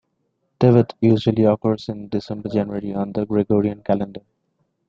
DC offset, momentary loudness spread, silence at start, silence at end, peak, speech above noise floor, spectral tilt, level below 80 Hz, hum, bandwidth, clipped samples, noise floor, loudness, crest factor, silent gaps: under 0.1%; 11 LU; 0.6 s; 0.7 s; -2 dBFS; 52 dB; -9.5 dB/octave; -54 dBFS; none; 7.2 kHz; under 0.1%; -71 dBFS; -20 LUFS; 18 dB; none